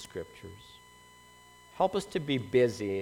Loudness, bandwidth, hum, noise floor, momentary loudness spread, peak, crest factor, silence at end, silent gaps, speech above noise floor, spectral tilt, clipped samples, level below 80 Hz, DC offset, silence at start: -30 LUFS; 16 kHz; 60 Hz at -60 dBFS; -56 dBFS; 22 LU; -14 dBFS; 18 dB; 0 s; none; 25 dB; -5.5 dB/octave; under 0.1%; -64 dBFS; under 0.1%; 0 s